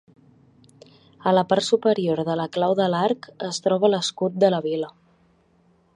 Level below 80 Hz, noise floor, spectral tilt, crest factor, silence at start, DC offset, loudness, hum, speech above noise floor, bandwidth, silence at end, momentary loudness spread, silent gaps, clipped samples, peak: -70 dBFS; -61 dBFS; -5 dB/octave; 18 dB; 1.2 s; under 0.1%; -22 LUFS; none; 39 dB; 11 kHz; 1.1 s; 8 LU; none; under 0.1%; -4 dBFS